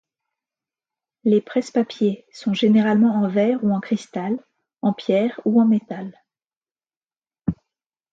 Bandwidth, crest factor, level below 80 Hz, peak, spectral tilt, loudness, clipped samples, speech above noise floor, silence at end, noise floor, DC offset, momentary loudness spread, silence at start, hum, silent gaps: 7.8 kHz; 16 dB; -58 dBFS; -6 dBFS; -7.5 dB/octave; -21 LUFS; under 0.1%; over 71 dB; 0.6 s; under -90 dBFS; under 0.1%; 12 LU; 1.25 s; none; 6.57-6.61 s, 6.71-6.75 s, 6.97-7.01 s